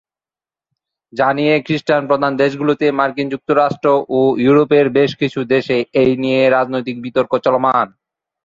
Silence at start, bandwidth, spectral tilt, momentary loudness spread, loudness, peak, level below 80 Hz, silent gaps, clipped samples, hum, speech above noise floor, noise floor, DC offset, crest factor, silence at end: 1.15 s; 7.6 kHz; -7.5 dB/octave; 7 LU; -15 LUFS; -2 dBFS; -56 dBFS; none; under 0.1%; none; over 75 dB; under -90 dBFS; under 0.1%; 14 dB; 0.6 s